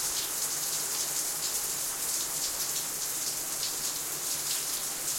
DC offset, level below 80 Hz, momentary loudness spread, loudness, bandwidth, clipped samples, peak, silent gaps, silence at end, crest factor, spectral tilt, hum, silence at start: under 0.1%; -64 dBFS; 2 LU; -29 LUFS; 16.5 kHz; under 0.1%; -16 dBFS; none; 0 s; 16 dB; 1 dB/octave; none; 0 s